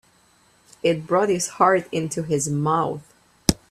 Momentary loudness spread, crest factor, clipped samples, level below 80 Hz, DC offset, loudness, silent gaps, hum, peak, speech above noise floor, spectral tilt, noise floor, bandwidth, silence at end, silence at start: 8 LU; 24 dB; under 0.1%; -46 dBFS; under 0.1%; -22 LUFS; none; 60 Hz at -45 dBFS; 0 dBFS; 37 dB; -4.5 dB/octave; -58 dBFS; 15.5 kHz; 0.15 s; 0.85 s